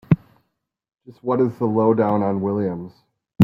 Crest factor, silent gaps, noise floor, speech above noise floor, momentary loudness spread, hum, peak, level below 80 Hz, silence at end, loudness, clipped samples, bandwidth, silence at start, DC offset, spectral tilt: 20 dB; none; -73 dBFS; 53 dB; 13 LU; none; -2 dBFS; -56 dBFS; 0 s; -21 LUFS; under 0.1%; 5.6 kHz; 0.1 s; under 0.1%; -10.5 dB/octave